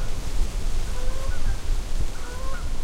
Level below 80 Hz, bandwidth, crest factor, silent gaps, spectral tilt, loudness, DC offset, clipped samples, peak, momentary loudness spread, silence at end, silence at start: -24 dBFS; 11.5 kHz; 10 dB; none; -4.5 dB/octave; -32 LUFS; under 0.1%; under 0.1%; -10 dBFS; 3 LU; 0 s; 0 s